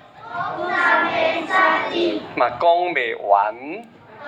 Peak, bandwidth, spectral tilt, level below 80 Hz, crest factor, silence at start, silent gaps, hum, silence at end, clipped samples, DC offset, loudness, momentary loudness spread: -2 dBFS; 9 kHz; -4.5 dB/octave; -66 dBFS; 18 dB; 0.15 s; none; none; 0 s; under 0.1%; under 0.1%; -19 LUFS; 13 LU